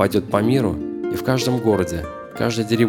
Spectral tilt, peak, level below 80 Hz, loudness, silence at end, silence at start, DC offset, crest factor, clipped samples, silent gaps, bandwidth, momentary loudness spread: -6 dB/octave; -2 dBFS; -44 dBFS; -21 LUFS; 0 s; 0 s; under 0.1%; 18 dB; under 0.1%; none; 19 kHz; 7 LU